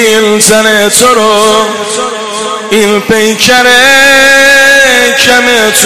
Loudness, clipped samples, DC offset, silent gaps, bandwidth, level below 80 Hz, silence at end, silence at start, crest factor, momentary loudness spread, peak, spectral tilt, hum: -4 LUFS; 3%; under 0.1%; none; 16 kHz; -40 dBFS; 0 s; 0 s; 6 dB; 10 LU; 0 dBFS; -1.5 dB/octave; none